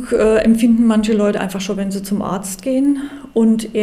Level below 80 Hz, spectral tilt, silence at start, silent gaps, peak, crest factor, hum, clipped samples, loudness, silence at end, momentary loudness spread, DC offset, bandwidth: -42 dBFS; -6 dB/octave; 0 s; none; -4 dBFS; 12 dB; none; under 0.1%; -16 LUFS; 0 s; 9 LU; under 0.1%; 15.5 kHz